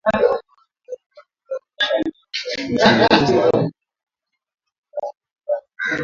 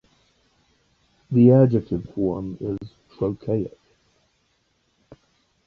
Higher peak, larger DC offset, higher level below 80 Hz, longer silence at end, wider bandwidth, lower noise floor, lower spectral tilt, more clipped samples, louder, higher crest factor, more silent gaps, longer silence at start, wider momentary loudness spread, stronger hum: first, 0 dBFS vs -4 dBFS; neither; about the same, -52 dBFS vs -52 dBFS; second, 0 s vs 0.55 s; first, 7.6 kHz vs 5.4 kHz; second, -51 dBFS vs -68 dBFS; second, -5 dB/octave vs -11.5 dB/octave; neither; first, -18 LUFS vs -21 LUFS; about the same, 20 dB vs 20 dB; first, 1.06-1.10 s, 4.03-4.07 s, 4.78-4.83 s, 5.31-5.36 s vs none; second, 0.05 s vs 1.3 s; first, 22 LU vs 17 LU; neither